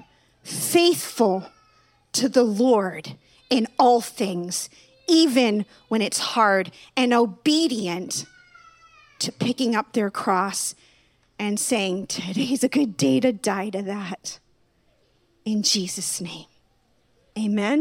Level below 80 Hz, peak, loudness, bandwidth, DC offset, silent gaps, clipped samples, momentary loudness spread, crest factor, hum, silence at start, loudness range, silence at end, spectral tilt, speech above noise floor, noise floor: -70 dBFS; -4 dBFS; -22 LUFS; 17.5 kHz; under 0.1%; none; under 0.1%; 12 LU; 18 dB; none; 0.45 s; 5 LU; 0 s; -3.5 dB/octave; 42 dB; -64 dBFS